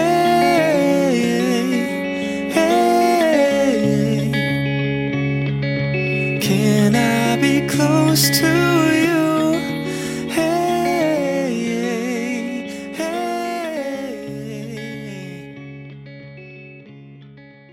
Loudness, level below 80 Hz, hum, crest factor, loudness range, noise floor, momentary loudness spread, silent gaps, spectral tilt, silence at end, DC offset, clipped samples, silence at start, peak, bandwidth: -18 LUFS; -50 dBFS; none; 16 dB; 12 LU; -43 dBFS; 16 LU; none; -5 dB/octave; 0.25 s; under 0.1%; under 0.1%; 0 s; -2 dBFS; 17 kHz